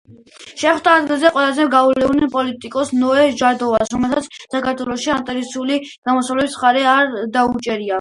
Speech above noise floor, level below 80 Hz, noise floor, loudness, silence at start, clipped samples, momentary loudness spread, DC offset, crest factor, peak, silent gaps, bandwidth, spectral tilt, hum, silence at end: 25 dB; -50 dBFS; -41 dBFS; -16 LUFS; 0.1 s; under 0.1%; 8 LU; under 0.1%; 16 dB; 0 dBFS; 5.98-6.02 s; 11.5 kHz; -3.5 dB/octave; none; 0 s